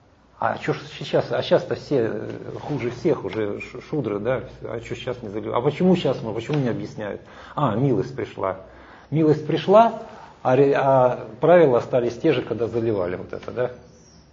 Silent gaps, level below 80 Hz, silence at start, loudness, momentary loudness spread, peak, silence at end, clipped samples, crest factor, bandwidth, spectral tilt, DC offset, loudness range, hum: none; -54 dBFS; 0.4 s; -22 LUFS; 15 LU; -2 dBFS; 0.55 s; under 0.1%; 20 dB; 7.8 kHz; -7.5 dB/octave; under 0.1%; 8 LU; none